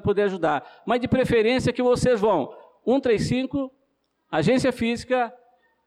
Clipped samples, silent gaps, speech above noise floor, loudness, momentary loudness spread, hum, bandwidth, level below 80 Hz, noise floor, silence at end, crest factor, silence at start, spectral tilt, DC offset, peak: under 0.1%; none; 49 dB; -23 LUFS; 9 LU; none; 12.5 kHz; -48 dBFS; -71 dBFS; 0.55 s; 12 dB; 0.05 s; -6 dB/octave; under 0.1%; -12 dBFS